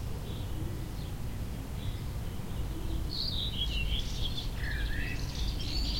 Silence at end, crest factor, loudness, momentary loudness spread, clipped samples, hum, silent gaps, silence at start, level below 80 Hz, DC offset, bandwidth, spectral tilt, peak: 0 s; 14 dB; -36 LUFS; 7 LU; under 0.1%; none; none; 0 s; -36 dBFS; under 0.1%; 16.5 kHz; -4.5 dB/octave; -20 dBFS